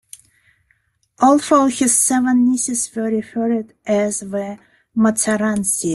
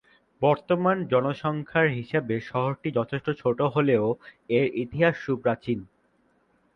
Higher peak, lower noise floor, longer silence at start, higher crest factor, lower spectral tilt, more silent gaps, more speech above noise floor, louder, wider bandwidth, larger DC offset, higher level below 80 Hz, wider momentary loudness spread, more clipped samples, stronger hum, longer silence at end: first, -2 dBFS vs -8 dBFS; about the same, -63 dBFS vs -66 dBFS; first, 1.2 s vs 0.4 s; about the same, 16 dB vs 18 dB; second, -4 dB/octave vs -8.5 dB/octave; neither; first, 46 dB vs 41 dB; first, -17 LUFS vs -26 LUFS; first, 12.5 kHz vs 6.4 kHz; neither; about the same, -58 dBFS vs -60 dBFS; first, 11 LU vs 6 LU; neither; neither; second, 0 s vs 0.9 s